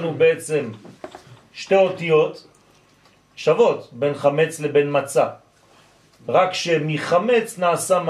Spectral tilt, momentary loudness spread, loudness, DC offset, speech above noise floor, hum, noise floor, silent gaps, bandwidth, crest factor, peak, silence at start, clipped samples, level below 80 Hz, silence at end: -4.5 dB/octave; 18 LU; -20 LUFS; under 0.1%; 36 dB; none; -55 dBFS; none; 14 kHz; 16 dB; -4 dBFS; 0 s; under 0.1%; -68 dBFS; 0 s